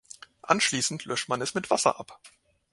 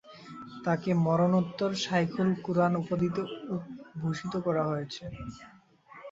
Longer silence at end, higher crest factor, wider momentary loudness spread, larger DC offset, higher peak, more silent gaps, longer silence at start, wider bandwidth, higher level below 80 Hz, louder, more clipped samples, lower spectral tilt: first, 0.45 s vs 0 s; first, 24 dB vs 18 dB; first, 21 LU vs 17 LU; neither; first, -4 dBFS vs -12 dBFS; neither; first, 0.45 s vs 0.05 s; first, 11.5 kHz vs 7.8 kHz; second, -68 dBFS vs -60 dBFS; first, -26 LUFS vs -30 LUFS; neither; second, -2.5 dB/octave vs -7 dB/octave